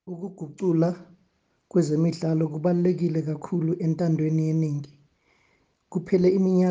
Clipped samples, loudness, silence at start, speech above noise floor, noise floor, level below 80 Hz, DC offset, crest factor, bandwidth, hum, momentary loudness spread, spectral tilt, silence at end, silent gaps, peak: under 0.1%; -25 LUFS; 0.05 s; 45 dB; -68 dBFS; -66 dBFS; under 0.1%; 16 dB; 7.8 kHz; none; 13 LU; -9 dB/octave; 0 s; none; -10 dBFS